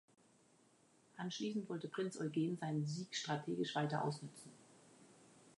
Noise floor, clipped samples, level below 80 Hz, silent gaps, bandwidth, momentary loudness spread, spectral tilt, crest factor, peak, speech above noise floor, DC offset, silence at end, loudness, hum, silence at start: -71 dBFS; under 0.1%; -88 dBFS; none; 11 kHz; 12 LU; -5.5 dB/octave; 18 dB; -26 dBFS; 30 dB; under 0.1%; 0.05 s; -42 LUFS; none; 1.15 s